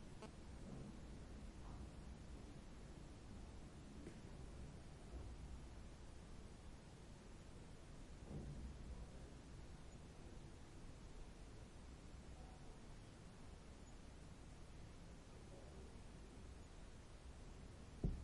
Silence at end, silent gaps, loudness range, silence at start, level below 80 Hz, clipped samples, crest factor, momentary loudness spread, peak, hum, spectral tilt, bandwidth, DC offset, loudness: 0 s; none; 3 LU; 0 s; -58 dBFS; under 0.1%; 26 dB; 5 LU; -30 dBFS; none; -6 dB/octave; 11.5 kHz; under 0.1%; -59 LUFS